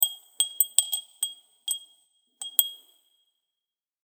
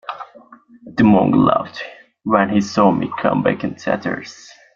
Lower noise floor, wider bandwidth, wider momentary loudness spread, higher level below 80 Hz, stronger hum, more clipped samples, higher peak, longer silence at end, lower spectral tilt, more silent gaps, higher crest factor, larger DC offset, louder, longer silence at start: first, -90 dBFS vs -45 dBFS; first, over 20 kHz vs 7.4 kHz; second, 11 LU vs 19 LU; second, under -90 dBFS vs -54 dBFS; neither; neither; about the same, 0 dBFS vs -2 dBFS; first, 1.3 s vs 0.4 s; second, 7 dB/octave vs -7 dB/octave; neither; first, 32 dB vs 16 dB; neither; second, -26 LUFS vs -17 LUFS; about the same, 0 s vs 0.1 s